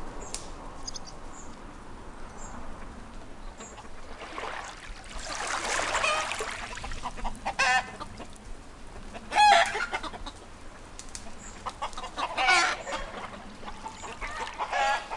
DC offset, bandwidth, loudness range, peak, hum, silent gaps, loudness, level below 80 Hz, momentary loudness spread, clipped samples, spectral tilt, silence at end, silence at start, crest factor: under 0.1%; 11.5 kHz; 16 LU; -8 dBFS; none; none; -28 LUFS; -44 dBFS; 23 LU; under 0.1%; -1.5 dB/octave; 0 s; 0 s; 24 dB